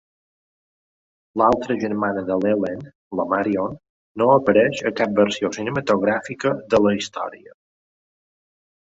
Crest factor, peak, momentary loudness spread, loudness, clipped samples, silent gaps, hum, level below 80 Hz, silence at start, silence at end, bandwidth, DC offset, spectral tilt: 20 dB; -2 dBFS; 12 LU; -21 LUFS; under 0.1%; 2.95-3.11 s, 3.89-4.15 s; none; -56 dBFS; 1.35 s; 1.45 s; 8 kHz; under 0.1%; -5.5 dB/octave